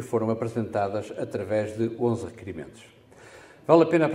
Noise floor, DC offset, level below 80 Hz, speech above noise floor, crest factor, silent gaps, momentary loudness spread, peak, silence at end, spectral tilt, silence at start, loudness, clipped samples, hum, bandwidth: -49 dBFS; under 0.1%; -64 dBFS; 24 dB; 22 dB; none; 19 LU; -4 dBFS; 0 s; -7.5 dB/octave; 0 s; -25 LUFS; under 0.1%; none; 12 kHz